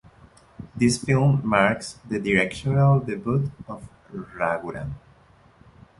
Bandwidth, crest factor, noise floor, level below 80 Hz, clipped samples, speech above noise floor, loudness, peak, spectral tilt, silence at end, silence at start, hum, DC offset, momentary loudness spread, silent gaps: 11.5 kHz; 22 dB; -55 dBFS; -50 dBFS; under 0.1%; 32 dB; -23 LUFS; -2 dBFS; -6.5 dB/octave; 1 s; 0.6 s; none; under 0.1%; 19 LU; none